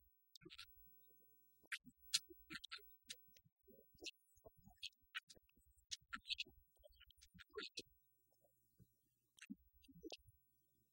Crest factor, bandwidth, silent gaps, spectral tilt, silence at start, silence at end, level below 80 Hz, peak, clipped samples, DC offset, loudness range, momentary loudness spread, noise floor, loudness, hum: 34 dB; 16.5 kHz; 0.37-0.41 s, 1.67-1.71 s, 3.52-3.56 s, 5.23-5.27 s; -0.5 dB/octave; 0 s; 0.6 s; -80 dBFS; -22 dBFS; under 0.1%; under 0.1%; 9 LU; 21 LU; -85 dBFS; -52 LUFS; none